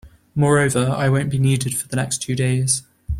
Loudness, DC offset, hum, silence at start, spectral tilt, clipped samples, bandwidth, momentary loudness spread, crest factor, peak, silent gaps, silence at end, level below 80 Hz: -19 LUFS; under 0.1%; none; 0.05 s; -5 dB/octave; under 0.1%; 15.5 kHz; 6 LU; 16 dB; -4 dBFS; none; 0 s; -40 dBFS